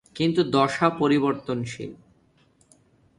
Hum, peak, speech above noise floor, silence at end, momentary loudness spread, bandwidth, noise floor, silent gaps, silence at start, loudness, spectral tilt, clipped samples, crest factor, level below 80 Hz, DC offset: none; -6 dBFS; 39 dB; 1.25 s; 14 LU; 11 kHz; -61 dBFS; none; 0.15 s; -23 LUFS; -6 dB/octave; under 0.1%; 20 dB; -62 dBFS; under 0.1%